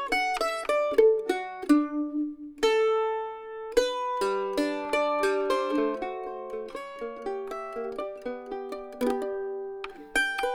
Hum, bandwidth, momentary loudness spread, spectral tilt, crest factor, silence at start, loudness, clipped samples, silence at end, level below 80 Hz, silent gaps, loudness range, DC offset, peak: none; 17 kHz; 12 LU; -3 dB/octave; 20 dB; 0 s; -28 LUFS; under 0.1%; 0 s; -56 dBFS; none; 8 LU; under 0.1%; -8 dBFS